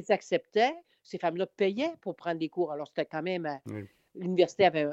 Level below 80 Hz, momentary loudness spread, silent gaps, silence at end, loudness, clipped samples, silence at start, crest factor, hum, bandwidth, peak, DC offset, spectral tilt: -78 dBFS; 15 LU; none; 0 s; -30 LUFS; under 0.1%; 0 s; 20 dB; none; 8 kHz; -10 dBFS; under 0.1%; -5.5 dB/octave